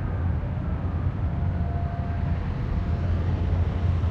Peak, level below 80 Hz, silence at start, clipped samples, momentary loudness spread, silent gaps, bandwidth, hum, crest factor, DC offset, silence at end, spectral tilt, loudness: -14 dBFS; -30 dBFS; 0 s; under 0.1%; 3 LU; none; 4.9 kHz; none; 12 dB; under 0.1%; 0 s; -9.5 dB/octave; -27 LUFS